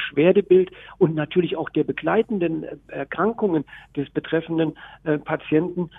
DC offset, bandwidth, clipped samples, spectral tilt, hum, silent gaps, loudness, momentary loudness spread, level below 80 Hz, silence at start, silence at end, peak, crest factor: under 0.1%; 3.9 kHz; under 0.1%; -10 dB/octave; none; none; -22 LUFS; 13 LU; -56 dBFS; 0 s; 0 s; -4 dBFS; 18 dB